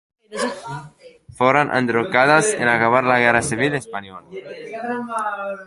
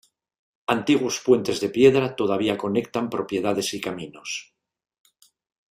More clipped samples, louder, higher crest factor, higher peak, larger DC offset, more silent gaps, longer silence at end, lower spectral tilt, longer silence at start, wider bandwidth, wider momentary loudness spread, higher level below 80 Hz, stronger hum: neither; first, -18 LUFS vs -23 LUFS; about the same, 18 dB vs 20 dB; about the same, -2 dBFS vs -4 dBFS; neither; neither; second, 0 s vs 1.3 s; about the same, -4 dB/octave vs -4.5 dB/octave; second, 0.3 s vs 0.7 s; second, 11.5 kHz vs 15.5 kHz; first, 19 LU vs 15 LU; first, -54 dBFS vs -62 dBFS; neither